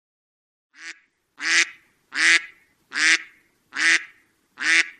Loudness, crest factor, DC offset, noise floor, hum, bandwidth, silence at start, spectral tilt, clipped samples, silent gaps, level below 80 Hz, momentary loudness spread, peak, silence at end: -20 LUFS; 24 dB; under 0.1%; -57 dBFS; none; 12 kHz; 0.8 s; 2.5 dB/octave; under 0.1%; none; -76 dBFS; 22 LU; -2 dBFS; 0.1 s